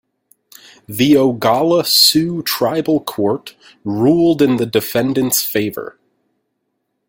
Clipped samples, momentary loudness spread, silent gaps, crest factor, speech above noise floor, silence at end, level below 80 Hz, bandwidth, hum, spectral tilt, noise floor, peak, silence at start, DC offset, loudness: under 0.1%; 14 LU; none; 16 dB; 56 dB; 1.2 s; -54 dBFS; 17 kHz; none; -4 dB/octave; -71 dBFS; 0 dBFS; 0.9 s; under 0.1%; -14 LUFS